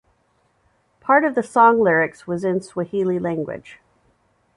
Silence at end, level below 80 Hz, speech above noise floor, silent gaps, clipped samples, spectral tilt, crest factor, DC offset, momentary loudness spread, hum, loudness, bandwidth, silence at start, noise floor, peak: 0.8 s; -62 dBFS; 45 dB; none; under 0.1%; -7 dB/octave; 18 dB; under 0.1%; 14 LU; none; -19 LUFS; 11.5 kHz; 1.05 s; -64 dBFS; -2 dBFS